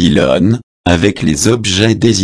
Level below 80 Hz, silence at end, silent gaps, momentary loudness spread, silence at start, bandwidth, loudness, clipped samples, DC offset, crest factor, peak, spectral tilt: -32 dBFS; 0 s; 0.63-0.84 s; 4 LU; 0 s; 11 kHz; -12 LUFS; 0.1%; under 0.1%; 10 dB; 0 dBFS; -5 dB/octave